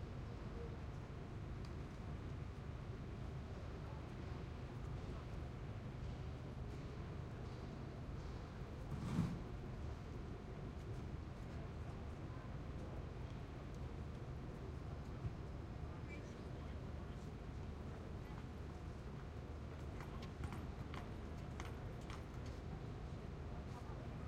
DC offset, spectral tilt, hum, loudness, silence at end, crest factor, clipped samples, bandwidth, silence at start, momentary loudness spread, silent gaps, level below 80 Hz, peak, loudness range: under 0.1%; -7.5 dB/octave; none; -50 LUFS; 0 s; 22 dB; under 0.1%; 13.5 kHz; 0 s; 2 LU; none; -54 dBFS; -26 dBFS; 3 LU